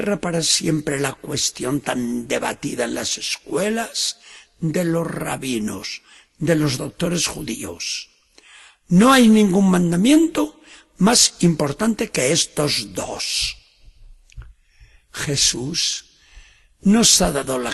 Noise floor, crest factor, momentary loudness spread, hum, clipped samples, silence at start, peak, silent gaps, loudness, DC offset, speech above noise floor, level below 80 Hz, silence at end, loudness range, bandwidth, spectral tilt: -51 dBFS; 20 dB; 13 LU; none; under 0.1%; 0 s; 0 dBFS; none; -19 LUFS; under 0.1%; 32 dB; -46 dBFS; 0 s; 8 LU; 12.5 kHz; -3.5 dB/octave